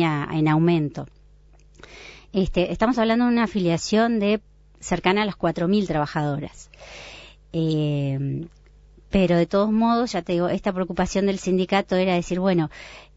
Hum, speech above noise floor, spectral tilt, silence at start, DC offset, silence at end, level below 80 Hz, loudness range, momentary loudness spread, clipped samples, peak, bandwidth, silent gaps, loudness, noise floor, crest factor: none; 30 dB; -6.5 dB/octave; 0 s; under 0.1%; 0.15 s; -44 dBFS; 4 LU; 19 LU; under 0.1%; -6 dBFS; 8 kHz; none; -22 LUFS; -51 dBFS; 18 dB